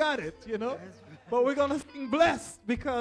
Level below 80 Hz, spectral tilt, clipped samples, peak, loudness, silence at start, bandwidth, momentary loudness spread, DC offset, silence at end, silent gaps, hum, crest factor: -54 dBFS; -4.5 dB/octave; under 0.1%; -12 dBFS; -29 LUFS; 0 s; 11 kHz; 11 LU; under 0.1%; 0 s; none; none; 18 dB